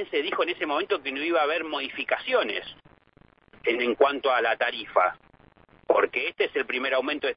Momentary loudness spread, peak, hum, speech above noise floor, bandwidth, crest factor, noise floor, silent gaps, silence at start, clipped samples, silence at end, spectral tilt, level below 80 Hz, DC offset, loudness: 7 LU; -6 dBFS; none; 33 dB; 5.6 kHz; 20 dB; -59 dBFS; none; 0 s; under 0.1%; 0 s; -6.5 dB/octave; -66 dBFS; under 0.1%; -26 LUFS